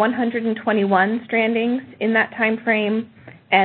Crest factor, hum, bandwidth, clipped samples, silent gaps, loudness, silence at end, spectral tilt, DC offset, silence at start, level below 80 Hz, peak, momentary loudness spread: 18 dB; none; 4.4 kHz; under 0.1%; none; -20 LUFS; 0 s; -10.5 dB/octave; under 0.1%; 0 s; -64 dBFS; -2 dBFS; 6 LU